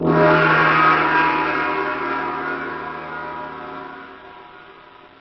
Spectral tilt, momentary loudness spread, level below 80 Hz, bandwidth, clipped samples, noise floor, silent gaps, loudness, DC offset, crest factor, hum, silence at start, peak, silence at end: -7.5 dB/octave; 19 LU; -52 dBFS; 6.2 kHz; under 0.1%; -44 dBFS; none; -18 LUFS; under 0.1%; 14 dB; none; 0 s; -6 dBFS; 0.5 s